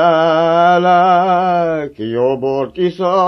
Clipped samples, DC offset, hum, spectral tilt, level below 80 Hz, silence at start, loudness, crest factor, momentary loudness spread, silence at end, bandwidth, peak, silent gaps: under 0.1%; under 0.1%; none; -7 dB/octave; -52 dBFS; 0 s; -13 LUFS; 12 dB; 8 LU; 0 s; 6.4 kHz; 0 dBFS; none